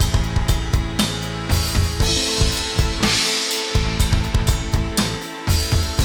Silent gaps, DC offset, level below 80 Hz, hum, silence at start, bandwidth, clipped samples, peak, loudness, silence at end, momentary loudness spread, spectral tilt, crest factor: none; under 0.1%; -24 dBFS; none; 0 s; over 20 kHz; under 0.1%; -6 dBFS; -20 LUFS; 0 s; 4 LU; -4 dB/octave; 14 dB